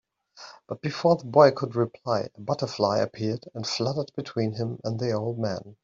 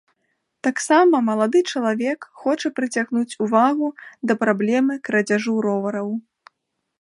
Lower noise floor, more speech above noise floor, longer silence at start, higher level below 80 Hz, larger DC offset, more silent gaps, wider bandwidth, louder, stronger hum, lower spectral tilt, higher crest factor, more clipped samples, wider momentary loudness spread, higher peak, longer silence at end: second, -49 dBFS vs -75 dBFS; second, 23 dB vs 55 dB; second, 0.35 s vs 0.65 s; first, -66 dBFS vs -74 dBFS; neither; neither; second, 7.6 kHz vs 11.5 kHz; second, -26 LUFS vs -20 LUFS; neither; about the same, -6 dB/octave vs -5 dB/octave; about the same, 22 dB vs 18 dB; neither; first, 13 LU vs 9 LU; about the same, -4 dBFS vs -2 dBFS; second, 0.1 s vs 0.8 s